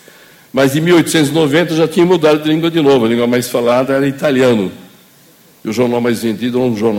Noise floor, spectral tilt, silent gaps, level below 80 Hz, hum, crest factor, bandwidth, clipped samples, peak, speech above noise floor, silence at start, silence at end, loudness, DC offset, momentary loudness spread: -45 dBFS; -5.5 dB/octave; none; -54 dBFS; none; 12 dB; 17 kHz; under 0.1%; 0 dBFS; 34 dB; 0.55 s; 0 s; -13 LUFS; under 0.1%; 6 LU